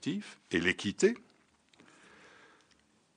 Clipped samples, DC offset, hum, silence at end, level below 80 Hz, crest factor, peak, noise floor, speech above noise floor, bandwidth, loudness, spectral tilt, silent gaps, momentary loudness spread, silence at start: under 0.1%; under 0.1%; none; 2 s; -70 dBFS; 22 dB; -14 dBFS; -69 dBFS; 37 dB; 10 kHz; -32 LUFS; -4 dB/octave; none; 11 LU; 0 s